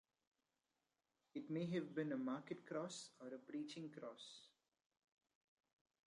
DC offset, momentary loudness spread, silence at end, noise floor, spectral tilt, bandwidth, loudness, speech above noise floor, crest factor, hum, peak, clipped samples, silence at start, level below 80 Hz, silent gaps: under 0.1%; 11 LU; 1.6 s; under -90 dBFS; -5.5 dB/octave; 11 kHz; -49 LUFS; over 42 dB; 20 dB; none; -32 dBFS; under 0.1%; 1.35 s; under -90 dBFS; none